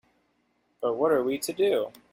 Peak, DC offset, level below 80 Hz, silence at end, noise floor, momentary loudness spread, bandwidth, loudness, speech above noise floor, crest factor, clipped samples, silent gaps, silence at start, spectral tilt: -12 dBFS; under 0.1%; -70 dBFS; 0.25 s; -71 dBFS; 6 LU; 16.5 kHz; -27 LUFS; 45 dB; 16 dB; under 0.1%; none; 0.8 s; -4 dB/octave